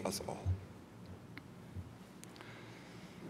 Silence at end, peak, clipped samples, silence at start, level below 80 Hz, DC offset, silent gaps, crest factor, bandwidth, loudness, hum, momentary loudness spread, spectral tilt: 0 s; -24 dBFS; under 0.1%; 0 s; -60 dBFS; under 0.1%; none; 22 dB; 16 kHz; -47 LUFS; none; 13 LU; -5 dB/octave